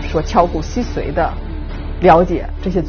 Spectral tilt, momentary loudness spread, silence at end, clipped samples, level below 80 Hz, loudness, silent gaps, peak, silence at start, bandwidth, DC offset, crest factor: -6 dB/octave; 16 LU; 0 s; under 0.1%; -24 dBFS; -16 LUFS; none; 0 dBFS; 0 s; 6.8 kHz; under 0.1%; 16 dB